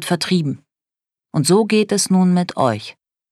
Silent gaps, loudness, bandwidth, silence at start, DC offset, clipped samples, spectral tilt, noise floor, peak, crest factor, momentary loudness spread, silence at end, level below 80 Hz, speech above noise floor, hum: none; -17 LUFS; 13.5 kHz; 0 s; under 0.1%; under 0.1%; -5 dB/octave; -87 dBFS; -2 dBFS; 16 dB; 12 LU; 0.4 s; -64 dBFS; 70 dB; none